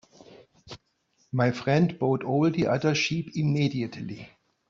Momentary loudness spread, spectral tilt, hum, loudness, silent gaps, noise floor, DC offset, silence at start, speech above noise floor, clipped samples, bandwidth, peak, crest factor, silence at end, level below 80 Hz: 21 LU; -6.5 dB/octave; none; -26 LUFS; none; -69 dBFS; under 0.1%; 0.3 s; 44 dB; under 0.1%; 7.6 kHz; -10 dBFS; 18 dB; 0.45 s; -62 dBFS